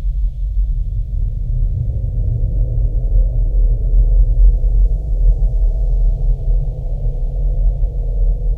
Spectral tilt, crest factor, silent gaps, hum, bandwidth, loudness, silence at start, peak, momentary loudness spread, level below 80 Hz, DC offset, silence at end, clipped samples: -11.5 dB/octave; 12 dB; none; none; 0.8 kHz; -19 LUFS; 0 s; -2 dBFS; 7 LU; -14 dBFS; under 0.1%; 0 s; under 0.1%